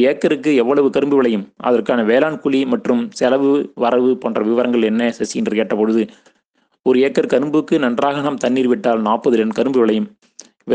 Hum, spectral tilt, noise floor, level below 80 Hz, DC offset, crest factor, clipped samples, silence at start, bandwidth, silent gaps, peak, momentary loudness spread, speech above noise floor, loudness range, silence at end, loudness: none; -6 dB/octave; -63 dBFS; -64 dBFS; under 0.1%; 16 dB; under 0.1%; 0 s; 9.4 kHz; none; 0 dBFS; 4 LU; 48 dB; 2 LU; 0 s; -16 LUFS